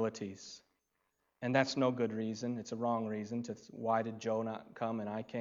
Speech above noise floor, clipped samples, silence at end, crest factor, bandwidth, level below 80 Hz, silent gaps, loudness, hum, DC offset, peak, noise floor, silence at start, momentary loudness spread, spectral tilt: 46 dB; under 0.1%; 0 s; 22 dB; 7.6 kHz; -82 dBFS; none; -37 LUFS; none; under 0.1%; -14 dBFS; -82 dBFS; 0 s; 12 LU; -5.5 dB/octave